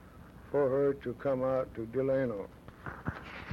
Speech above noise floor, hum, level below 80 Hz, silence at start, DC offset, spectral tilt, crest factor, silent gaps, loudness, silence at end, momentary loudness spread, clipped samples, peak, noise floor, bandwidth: 21 dB; none; -58 dBFS; 0 s; under 0.1%; -8.5 dB/octave; 14 dB; none; -33 LUFS; 0 s; 17 LU; under 0.1%; -20 dBFS; -52 dBFS; 13 kHz